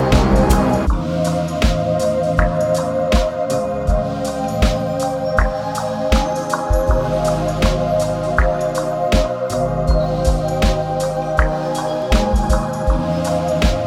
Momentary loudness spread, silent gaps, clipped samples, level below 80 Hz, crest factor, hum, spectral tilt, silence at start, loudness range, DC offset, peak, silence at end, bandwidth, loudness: 4 LU; none; under 0.1%; -22 dBFS; 16 dB; none; -6 dB/octave; 0 s; 1 LU; under 0.1%; 0 dBFS; 0 s; 15.5 kHz; -18 LUFS